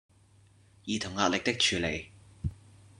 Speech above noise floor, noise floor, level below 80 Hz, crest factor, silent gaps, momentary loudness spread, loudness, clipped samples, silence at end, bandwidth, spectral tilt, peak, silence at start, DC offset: 31 dB; -61 dBFS; -52 dBFS; 24 dB; none; 14 LU; -30 LUFS; under 0.1%; 0.45 s; 12 kHz; -3 dB/octave; -10 dBFS; 0.85 s; under 0.1%